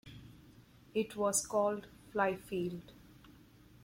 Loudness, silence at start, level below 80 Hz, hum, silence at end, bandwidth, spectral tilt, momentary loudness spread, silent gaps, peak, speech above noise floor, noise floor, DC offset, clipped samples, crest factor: -36 LUFS; 0.05 s; -66 dBFS; none; 0.5 s; 16.5 kHz; -4 dB/octave; 20 LU; none; -18 dBFS; 25 dB; -60 dBFS; under 0.1%; under 0.1%; 20 dB